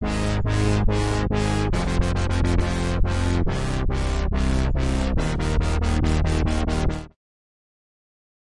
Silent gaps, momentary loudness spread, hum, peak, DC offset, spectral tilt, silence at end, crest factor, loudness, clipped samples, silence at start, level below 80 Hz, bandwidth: none; 3 LU; none; -8 dBFS; under 0.1%; -6 dB/octave; 1.5 s; 14 dB; -24 LUFS; under 0.1%; 0 s; -26 dBFS; 11.5 kHz